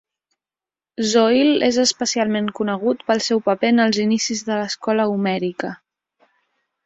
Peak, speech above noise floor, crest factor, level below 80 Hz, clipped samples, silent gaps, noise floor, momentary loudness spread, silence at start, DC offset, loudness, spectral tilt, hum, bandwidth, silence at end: -4 dBFS; over 72 dB; 16 dB; -64 dBFS; under 0.1%; none; under -90 dBFS; 8 LU; 1 s; under 0.1%; -19 LUFS; -4 dB/octave; none; 8.2 kHz; 1.1 s